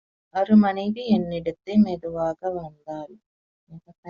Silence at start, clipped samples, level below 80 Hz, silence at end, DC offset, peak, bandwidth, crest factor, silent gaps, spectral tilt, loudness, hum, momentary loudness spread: 0.35 s; under 0.1%; -58 dBFS; 0 s; under 0.1%; -6 dBFS; 6.4 kHz; 18 dB; 3.26-3.67 s, 3.98-4.03 s; -7 dB/octave; -23 LUFS; none; 18 LU